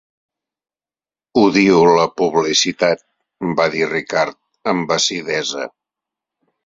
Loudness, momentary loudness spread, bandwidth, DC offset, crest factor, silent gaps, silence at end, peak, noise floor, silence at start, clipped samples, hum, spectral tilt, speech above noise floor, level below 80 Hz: -16 LUFS; 12 LU; 8 kHz; under 0.1%; 18 dB; none; 0.95 s; 0 dBFS; under -90 dBFS; 1.35 s; under 0.1%; none; -3.5 dB/octave; over 74 dB; -58 dBFS